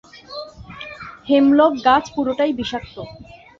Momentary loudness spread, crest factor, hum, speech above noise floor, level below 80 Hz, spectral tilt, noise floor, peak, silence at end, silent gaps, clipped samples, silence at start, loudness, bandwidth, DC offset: 21 LU; 18 dB; none; 19 dB; -50 dBFS; -5.5 dB/octave; -36 dBFS; -2 dBFS; 0.35 s; none; under 0.1%; 0.15 s; -17 LUFS; 7.2 kHz; under 0.1%